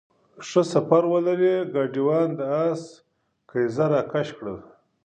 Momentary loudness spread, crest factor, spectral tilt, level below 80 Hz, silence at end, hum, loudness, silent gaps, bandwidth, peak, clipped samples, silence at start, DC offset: 13 LU; 20 dB; -7 dB/octave; -66 dBFS; 0.45 s; none; -23 LUFS; none; 9.4 kHz; -4 dBFS; under 0.1%; 0.4 s; under 0.1%